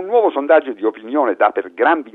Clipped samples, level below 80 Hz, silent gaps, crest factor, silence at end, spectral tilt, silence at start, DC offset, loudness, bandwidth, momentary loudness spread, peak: under 0.1%; -68 dBFS; none; 16 dB; 0.05 s; -6.5 dB/octave; 0 s; under 0.1%; -16 LUFS; 4.1 kHz; 6 LU; 0 dBFS